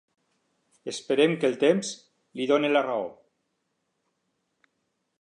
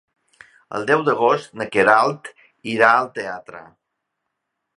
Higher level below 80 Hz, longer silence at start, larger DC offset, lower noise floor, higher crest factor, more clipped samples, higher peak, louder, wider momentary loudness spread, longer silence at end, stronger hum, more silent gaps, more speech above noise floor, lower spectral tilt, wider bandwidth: second, -82 dBFS vs -66 dBFS; first, 0.85 s vs 0.7 s; neither; about the same, -77 dBFS vs -78 dBFS; about the same, 20 dB vs 20 dB; neither; second, -8 dBFS vs 0 dBFS; second, -25 LUFS vs -18 LUFS; about the same, 17 LU vs 19 LU; first, 2.1 s vs 1.15 s; neither; neither; second, 53 dB vs 59 dB; about the same, -4.5 dB/octave vs -5 dB/octave; about the same, 11 kHz vs 11 kHz